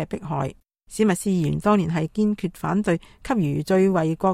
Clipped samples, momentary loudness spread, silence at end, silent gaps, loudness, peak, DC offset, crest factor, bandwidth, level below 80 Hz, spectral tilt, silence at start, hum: under 0.1%; 8 LU; 0 s; none; -23 LUFS; -6 dBFS; under 0.1%; 16 dB; 15 kHz; -50 dBFS; -7 dB/octave; 0 s; none